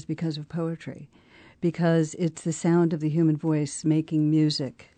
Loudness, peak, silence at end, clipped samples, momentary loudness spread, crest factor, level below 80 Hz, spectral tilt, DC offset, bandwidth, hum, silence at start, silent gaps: -25 LUFS; -12 dBFS; 0.15 s; under 0.1%; 9 LU; 12 dB; -66 dBFS; -6.5 dB/octave; under 0.1%; 9.4 kHz; none; 0.1 s; none